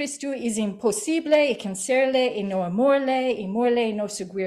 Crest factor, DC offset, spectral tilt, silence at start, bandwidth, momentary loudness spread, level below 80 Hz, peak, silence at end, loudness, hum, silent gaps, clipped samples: 14 dB; under 0.1%; -4 dB/octave; 0 s; 14 kHz; 8 LU; -66 dBFS; -8 dBFS; 0 s; -23 LUFS; none; none; under 0.1%